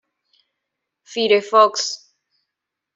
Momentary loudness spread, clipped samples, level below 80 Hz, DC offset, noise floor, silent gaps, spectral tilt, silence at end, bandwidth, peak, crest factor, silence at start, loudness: 16 LU; under 0.1%; -76 dBFS; under 0.1%; -82 dBFS; none; -1.5 dB/octave; 1 s; 7.8 kHz; -2 dBFS; 20 dB; 1.1 s; -17 LUFS